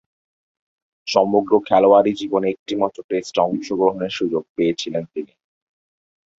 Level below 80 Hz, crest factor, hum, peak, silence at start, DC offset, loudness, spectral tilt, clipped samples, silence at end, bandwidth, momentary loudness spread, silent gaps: -62 dBFS; 20 dB; none; 0 dBFS; 1.05 s; under 0.1%; -19 LUFS; -5.5 dB/octave; under 0.1%; 1.15 s; 8 kHz; 12 LU; 2.59-2.66 s, 3.04-3.09 s, 4.49-4.56 s